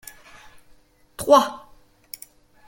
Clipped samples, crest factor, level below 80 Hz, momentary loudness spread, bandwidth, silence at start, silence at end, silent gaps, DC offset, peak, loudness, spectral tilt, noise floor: under 0.1%; 24 dB; -58 dBFS; 26 LU; 17 kHz; 1.2 s; 1.1 s; none; under 0.1%; -2 dBFS; -19 LUFS; -3 dB/octave; -54 dBFS